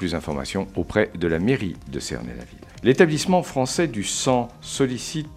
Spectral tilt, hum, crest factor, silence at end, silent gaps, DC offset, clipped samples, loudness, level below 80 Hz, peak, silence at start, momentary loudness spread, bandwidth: -5 dB/octave; none; 22 dB; 0 s; none; under 0.1%; under 0.1%; -23 LUFS; -44 dBFS; -2 dBFS; 0 s; 13 LU; 15 kHz